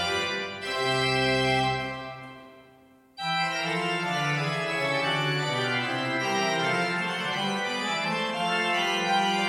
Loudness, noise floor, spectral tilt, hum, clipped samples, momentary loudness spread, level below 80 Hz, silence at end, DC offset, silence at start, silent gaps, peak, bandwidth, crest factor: -26 LUFS; -56 dBFS; -4 dB/octave; none; under 0.1%; 7 LU; -60 dBFS; 0 s; under 0.1%; 0 s; none; -12 dBFS; 16 kHz; 16 dB